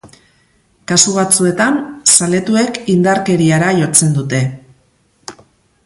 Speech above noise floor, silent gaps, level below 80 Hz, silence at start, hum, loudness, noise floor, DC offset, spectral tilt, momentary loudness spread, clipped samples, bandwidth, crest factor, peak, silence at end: 43 dB; none; -52 dBFS; 0.05 s; none; -12 LUFS; -55 dBFS; under 0.1%; -4 dB/octave; 8 LU; under 0.1%; 16 kHz; 14 dB; 0 dBFS; 0.55 s